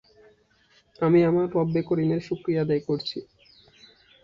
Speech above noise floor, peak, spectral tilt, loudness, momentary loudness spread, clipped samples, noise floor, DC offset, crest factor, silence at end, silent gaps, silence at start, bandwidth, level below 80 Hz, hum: 39 dB; -10 dBFS; -8.5 dB/octave; -24 LUFS; 9 LU; under 0.1%; -62 dBFS; under 0.1%; 16 dB; 1 s; none; 1 s; 7.2 kHz; -60 dBFS; none